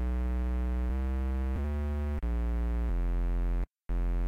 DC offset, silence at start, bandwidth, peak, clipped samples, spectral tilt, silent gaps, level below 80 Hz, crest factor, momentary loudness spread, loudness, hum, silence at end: under 0.1%; 0 s; 4.1 kHz; -26 dBFS; under 0.1%; -9 dB/octave; none; -30 dBFS; 4 dB; 2 LU; -34 LUFS; none; 0 s